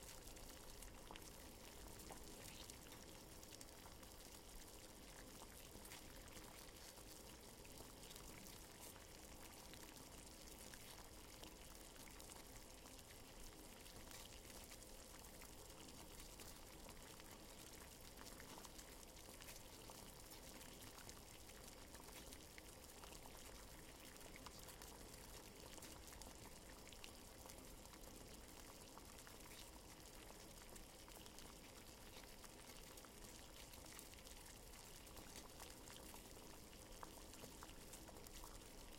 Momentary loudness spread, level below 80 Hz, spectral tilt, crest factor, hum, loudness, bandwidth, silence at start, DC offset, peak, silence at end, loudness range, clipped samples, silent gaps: 2 LU; -66 dBFS; -2.5 dB/octave; 26 dB; none; -58 LUFS; 16.5 kHz; 0 s; under 0.1%; -34 dBFS; 0 s; 1 LU; under 0.1%; none